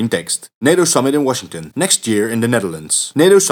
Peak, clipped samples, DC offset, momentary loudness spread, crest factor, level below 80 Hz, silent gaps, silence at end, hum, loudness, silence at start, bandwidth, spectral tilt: 0 dBFS; under 0.1%; under 0.1%; 8 LU; 14 dB; -60 dBFS; 0.55-0.61 s; 0 s; none; -15 LUFS; 0 s; 19 kHz; -3.5 dB/octave